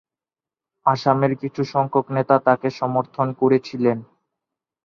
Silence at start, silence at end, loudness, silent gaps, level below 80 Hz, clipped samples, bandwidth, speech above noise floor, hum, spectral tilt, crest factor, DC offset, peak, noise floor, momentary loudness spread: 0.85 s; 0.8 s; -20 LUFS; none; -64 dBFS; under 0.1%; 7 kHz; over 70 dB; none; -8 dB/octave; 20 dB; under 0.1%; -2 dBFS; under -90 dBFS; 6 LU